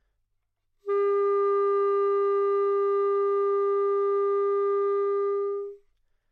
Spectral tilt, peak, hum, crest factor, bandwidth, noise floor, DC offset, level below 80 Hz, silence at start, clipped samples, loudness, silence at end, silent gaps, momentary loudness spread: -5.5 dB/octave; -18 dBFS; none; 6 dB; 4.2 kHz; -76 dBFS; under 0.1%; -76 dBFS; 0.85 s; under 0.1%; -25 LUFS; 0.55 s; none; 5 LU